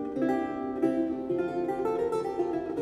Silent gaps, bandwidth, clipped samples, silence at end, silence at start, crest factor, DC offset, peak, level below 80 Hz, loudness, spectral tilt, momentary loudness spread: none; 11 kHz; under 0.1%; 0 s; 0 s; 16 dB; under 0.1%; -14 dBFS; -60 dBFS; -30 LUFS; -7.5 dB/octave; 3 LU